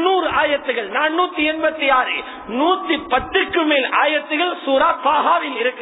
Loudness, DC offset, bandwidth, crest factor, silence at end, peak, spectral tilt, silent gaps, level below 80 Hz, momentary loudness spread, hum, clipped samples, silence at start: -18 LUFS; under 0.1%; 4 kHz; 14 dB; 0 s; -4 dBFS; -6.5 dB/octave; none; -50 dBFS; 5 LU; none; under 0.1%; 0 s